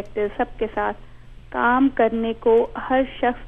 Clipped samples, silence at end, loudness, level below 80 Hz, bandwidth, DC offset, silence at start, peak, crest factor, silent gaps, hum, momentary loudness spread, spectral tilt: under 0.1%; 0 s; -21 LUFS; -42 dBFS; 3.9 kHz; under 0.1%; 0 s; -6 dBFS; 16 dB; none; none; 9 LU; -7.5 dB/octave